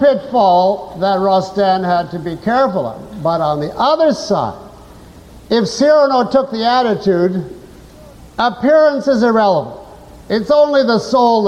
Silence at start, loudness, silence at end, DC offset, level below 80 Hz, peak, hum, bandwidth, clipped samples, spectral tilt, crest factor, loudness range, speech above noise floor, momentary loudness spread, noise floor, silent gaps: 0 s; -14 LUFS; 0 s; under 0.1%; -46 dBFS; -2 dBFS; none; 11.5 kHz; under 0.1%; -6 dB/octave; 12 dB; 3 LU; 25 dB; 10 LU; -38 dBFS; none